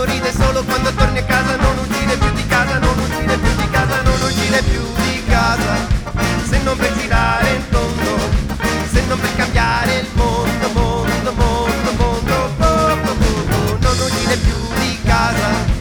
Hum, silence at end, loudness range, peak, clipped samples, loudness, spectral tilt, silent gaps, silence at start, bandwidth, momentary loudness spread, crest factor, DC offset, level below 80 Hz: none; 0 s; 1 LU; 0 dBFS; under 0.1%; -16 LUFS; -5 dB/octave; none; 0 s; over 20 kHz; 3 LU; 14 dB; under 0.1%; -22 dBFS